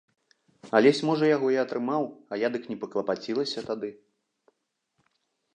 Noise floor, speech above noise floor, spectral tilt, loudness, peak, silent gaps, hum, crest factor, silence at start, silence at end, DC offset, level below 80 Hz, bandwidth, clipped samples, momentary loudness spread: -77 dBFS; 51 dB; -5.5 dB/octave; -27 LUFS; -6 dBFS; none; none; 22 dB; 0.65 s; 1.6 s; under 0.1%; -78 dBFS; 9.8 kHz; under 0.1%; 12 LU